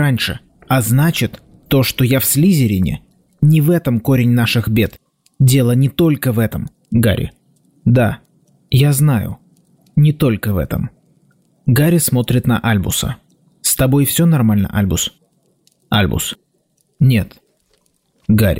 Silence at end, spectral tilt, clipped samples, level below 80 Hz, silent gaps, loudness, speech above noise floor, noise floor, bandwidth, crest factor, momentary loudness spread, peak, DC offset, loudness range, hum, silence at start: 0 s; -5.5 dB/octave; under 0.1%; -38 dBFS; none; -15 LUFS; 49 dB; -62 dBFS; 16.5 kHz; 12 dB; 11 LU; -4 dBFS; 0.2%; 3 LU; none; 0 s